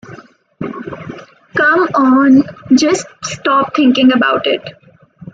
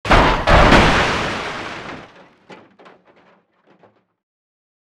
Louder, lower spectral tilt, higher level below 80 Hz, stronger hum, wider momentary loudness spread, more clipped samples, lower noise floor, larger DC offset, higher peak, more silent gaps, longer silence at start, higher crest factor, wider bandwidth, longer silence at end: about the same, -12 LUFS vs -14 LUFS; about the same, -4 dB/octave vs -5 dB/octave; second, -56 dBFS vs -26 dBFS; neither; second, 18 LU vs 21 LU; neither; second, -38 dBFS vs -56 dBFS; neither; about the same, 0 dBFS vs 0 dBFS; neither; about the same, 0.1 s vs 0.05 s; second, 12 dB vs 18 dB; second, 8.8 kHz vs 12.5 kHz; second, 0.65 s vs 2.4 s